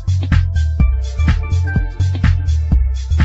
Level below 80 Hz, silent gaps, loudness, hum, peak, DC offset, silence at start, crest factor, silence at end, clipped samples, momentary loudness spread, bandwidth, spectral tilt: -18 dBFS; none; -17 LUFS; none; -2 dBFS; under 0.1%; 0 s; 12 dB; 0 s; under 0.1%; 3 LU; 7.8 kHz; -7 dB/octave